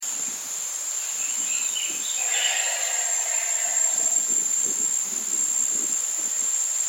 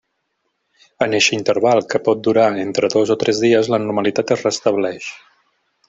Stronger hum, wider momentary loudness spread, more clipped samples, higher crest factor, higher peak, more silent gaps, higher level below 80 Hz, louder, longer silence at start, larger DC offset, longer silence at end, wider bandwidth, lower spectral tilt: neither; about the same, 6 LU vs 6 LU; neither; about the same, 16 dB vs 16 dB; second, -10 dBFS vs -2 dBFS; neither; second, under -90 dBFS vs -60 dBFS; second, -22 LUFS vs -17 LUFS; second, 0 s vs 1 s; neither; second, 0 s vs 0.75 s; first, 17.5 kHz vs 8 kHz; second, 2.5 dB/octave vs -4 dB/octave